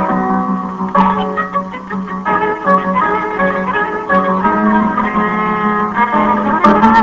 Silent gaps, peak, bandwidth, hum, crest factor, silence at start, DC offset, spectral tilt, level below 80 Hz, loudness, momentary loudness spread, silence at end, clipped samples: none; 0 dBFS; 7.4 kHz; none; 14 dB; 0 s; under 0.1%; -8 dB/octave; -42 dBFS; -14 LUFS; 7 LU; 0 s; under 0.1%